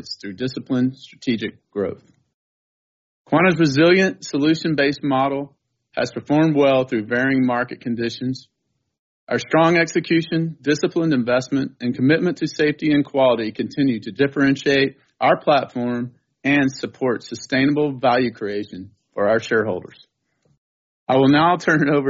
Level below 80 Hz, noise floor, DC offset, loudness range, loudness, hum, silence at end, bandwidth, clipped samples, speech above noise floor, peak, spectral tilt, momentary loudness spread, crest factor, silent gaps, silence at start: -60 dBFS; -65 dBFS; under 0.1%; 3 LU; -19 LUFS; none; 0 s; 7.6 kHz; under 0.1%; 46 dB; -4 dBFS; -4.5 dB/octave; 12 LU; 16 dB; 2.34-3.25 s, 8.99-9.27 s, 20.58-21.07 s; 0.05 s